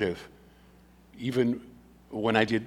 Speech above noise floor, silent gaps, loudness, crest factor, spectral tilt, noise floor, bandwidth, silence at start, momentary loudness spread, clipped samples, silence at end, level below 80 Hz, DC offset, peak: 29 dB; none; -29 LUFS; 24 dB; -6.5 dB/octave; -56 dBFS; 15 kHz; 0 s; 16 LU; under 0.1%; 0 s; -60 dBFS; under 0.1%; -8 dBFS